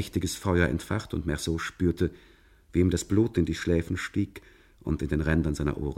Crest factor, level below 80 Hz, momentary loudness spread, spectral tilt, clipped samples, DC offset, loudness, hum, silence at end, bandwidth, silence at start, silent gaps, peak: 18 dB; -40 dBFS; 6 LU; -6 dB/octave; under 0.1%; under 0.1%; -28 LUFS; none; 0 s; 16 kHz; 0 s; none; -8 dBFS